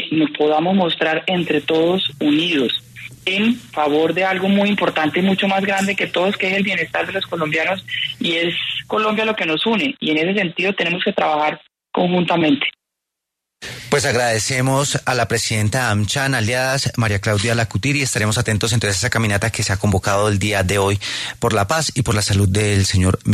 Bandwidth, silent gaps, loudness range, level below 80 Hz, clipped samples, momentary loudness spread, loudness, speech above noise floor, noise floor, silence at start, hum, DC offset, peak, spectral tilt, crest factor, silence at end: 13.5 kHz; none; 2 LU; -46 dBFS; under 0.1%; 4 LU; -18 LUFS; 63 dB; -81 dBFS; 0 s; none; under 0.1%; -2 dBFS; -4.5 dB/octave; 16 dB; 0 s